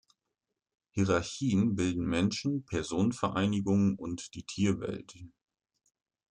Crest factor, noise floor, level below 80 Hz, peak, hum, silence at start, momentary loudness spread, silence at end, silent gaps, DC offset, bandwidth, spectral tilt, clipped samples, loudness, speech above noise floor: 18 dB; -87 dBFS; -60 dBFS; -14 dBFS; none; 0.95 s; 11 LU; 1.05 s; none; under 0.1%; 10 kHz; -6 dB/octave; under 0.1%; -31 LUFS; 57 dB